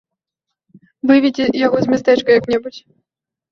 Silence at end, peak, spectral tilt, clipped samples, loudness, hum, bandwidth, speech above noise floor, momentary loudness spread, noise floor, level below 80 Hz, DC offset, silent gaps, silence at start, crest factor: 0.7 s; -2 dBFS; -6 dB/octave; under 0.1%; -15 LUFS; none; 7 kHz; 69 dB; 9 LU; -83 dBFS; -56 dBFS; under 0.1%; none; 1.05 s; 16 dB